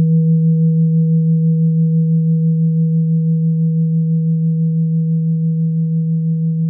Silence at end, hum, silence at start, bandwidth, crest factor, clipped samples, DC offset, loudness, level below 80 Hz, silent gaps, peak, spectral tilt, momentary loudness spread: 0 s; none; 0 s; 0.5 kHz; 6 dB; under 0.1%; under 0.1%; -15 LUFS; -70 dBFS; none; -8 dBFS; -18 dB/octave; 3 LU